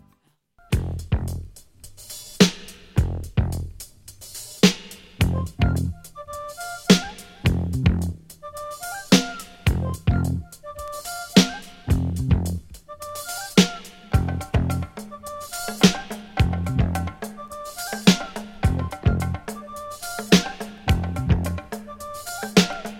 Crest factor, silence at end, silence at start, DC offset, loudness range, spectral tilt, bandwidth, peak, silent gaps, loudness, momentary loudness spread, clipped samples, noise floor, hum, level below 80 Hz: 24 dB; 0 s; 0.7 s; under 0.1%; 2 LU; -5 dB/octave; 16.5 kHz; 0 dBFS; none; -23 LUFS; 17 LU; under 0.1%; -63 dBFS; none; -34 dBFS